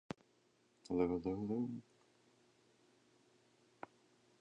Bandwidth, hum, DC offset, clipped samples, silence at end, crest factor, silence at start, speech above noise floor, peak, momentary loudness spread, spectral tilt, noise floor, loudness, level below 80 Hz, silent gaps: 9.6 kHz; none; under 0.1%; under 0.1%; 2.6 s; 22 dB; 0.9 s; 36 dB; -22 dBFS; 20 LU; -8 dB/octave; -75 dBFS; -40 LUFS; -70 dBFS; none